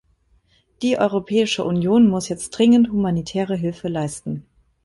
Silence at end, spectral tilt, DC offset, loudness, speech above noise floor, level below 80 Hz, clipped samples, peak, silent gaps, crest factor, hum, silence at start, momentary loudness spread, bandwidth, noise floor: 0.45 s; -6 dB/octave; under 0.1%; -20 LUFS; 42 dB; -52 dBFS; under 0.1%; -4 dBFS; none; 16 dB; none; 0.8 s; 11 LU; 11.5 kHz; -60 dBFS